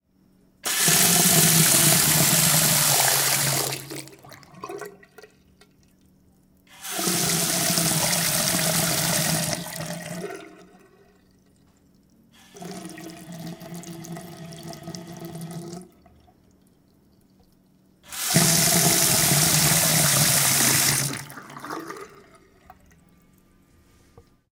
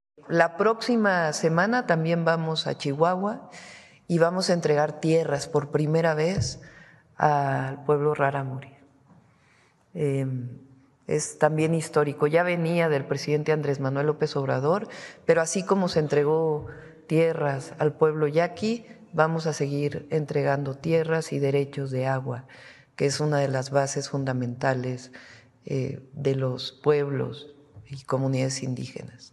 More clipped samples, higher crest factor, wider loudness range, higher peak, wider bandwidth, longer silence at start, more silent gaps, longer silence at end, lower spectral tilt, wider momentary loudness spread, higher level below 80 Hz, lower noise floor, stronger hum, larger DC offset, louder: neither; about the same, 22 dB vs 22 dB; first, 23 LU vs 4 LU; about the same, -4 dBFS vs -4 dBFS; first, 18 kHz vs 12 kHz; first, 0.65 s vs 0.25 s; neither; first, 2.45 s vs 0.05 s; second, -2 dB/octave vs -5.5 dB/octave; first, 23 LU vs 11 LU; about the same, -56 dBFS vs -60 dBFS; about the same, -60 dBFS vs -61 dBFS; neither; neither; first, -18 LUFS vs -25 LUFS